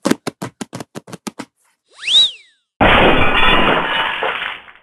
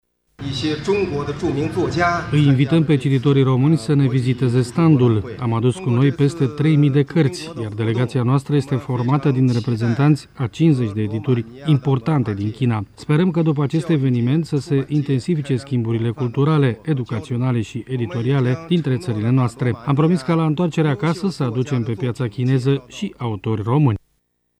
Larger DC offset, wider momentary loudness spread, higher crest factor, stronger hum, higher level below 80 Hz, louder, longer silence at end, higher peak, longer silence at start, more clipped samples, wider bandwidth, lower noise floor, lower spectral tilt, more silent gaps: neither; first, 20 LU vs 7 LU; about the same, 16 dB vs 16 dB; neither; first, -28 dBFS vs -50 dBFS; first, -13 LUFS vs -19 LUFS; second, 0.25 s vs 0.6 s; first, 0 dBFS vs -4 dBFS; second, 0.05 s vs 0.4 s; neither; first, 13 kHz vs 10.5 kHz; second, -58 dBFS vs -68 dBFS; second, -3.5 dB/octave vs -8 dB/octave; neither